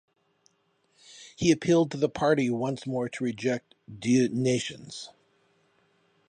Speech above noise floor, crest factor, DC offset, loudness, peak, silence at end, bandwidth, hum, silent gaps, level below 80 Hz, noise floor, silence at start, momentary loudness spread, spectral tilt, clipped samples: 44 dB; 20 dB; under 0.1%; -27 LUFS; -10 dBFS; 1.2 s; 10 kHz; none; none; -62 dBFS; -70 dBFS; 1.1 s; 17 LU; -5.5 dB/octave; under 0.1%